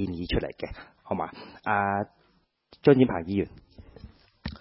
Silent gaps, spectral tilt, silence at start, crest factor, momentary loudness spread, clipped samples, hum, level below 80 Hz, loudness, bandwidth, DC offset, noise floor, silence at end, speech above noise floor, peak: none; -11 dB/octave; 0 s; 22 dB; 18 LU; under 0.1%; none; -46 dBFS; -27 LUFS; 5.8 kHz; under 0.1%; -67 dBFS; 0.05 s; 41 dB; -6 dBFS